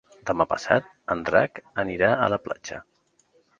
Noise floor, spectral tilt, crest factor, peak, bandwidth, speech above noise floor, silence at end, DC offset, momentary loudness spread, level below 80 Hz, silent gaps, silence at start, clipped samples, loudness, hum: -64 dBFS; -5.5 dB/octave; 24 dB; -2 dBFS; 7.6 kHz; 40 dB; 0.8 s; under 0.1%; 12 LU; -56 dBFS; none; 0.25 s; under 0.1%; -24 LUFS; none